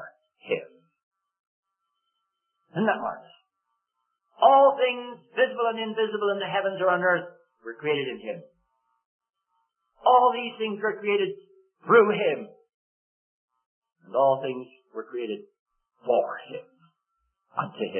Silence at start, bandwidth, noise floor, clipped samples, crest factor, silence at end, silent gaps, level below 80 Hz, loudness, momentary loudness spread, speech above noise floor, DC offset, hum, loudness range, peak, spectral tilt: 0 s; 3.4 kHz; -80 dBFS; under 0.1%; 22 dB; 0 s; 1.03-1.11 s, 1.40-1.63 s, 9.05-9.19 s, 12.74-13.48 s, 13.66-13.82 s, 15.59-15.66 s; -80 dBFS; -25 LUFS; 21 LU; 56 dB; under 0.1%; none; 9 LU; -6 dBFS; -9 dB/octave